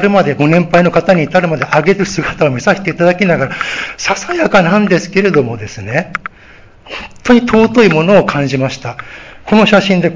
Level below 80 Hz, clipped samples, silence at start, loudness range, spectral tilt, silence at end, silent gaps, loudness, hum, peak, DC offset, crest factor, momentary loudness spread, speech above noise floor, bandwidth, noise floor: -42 dBFS; 0.4%; 0 s; 2 LU; -6 dB/octave; 0 s; none; -11 LUFS; none; 0 dBFS; under 0.1%; 12 dB; 15 LU; 28 dB; 7.6 kHz; -39 dBFS